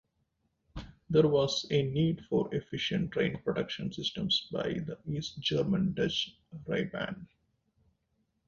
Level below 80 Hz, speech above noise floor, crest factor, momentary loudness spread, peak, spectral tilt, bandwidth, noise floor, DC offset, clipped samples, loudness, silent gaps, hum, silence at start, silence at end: -58 dBFS; 46 dB; 20 dB; 11 LU; -12 dBFS; -6 dB/octave; 7.6 kHz; -78 dBFS; under 0.1%; under 0.1%; -31 LUFS; none; none; 0.75 s; 1.25 s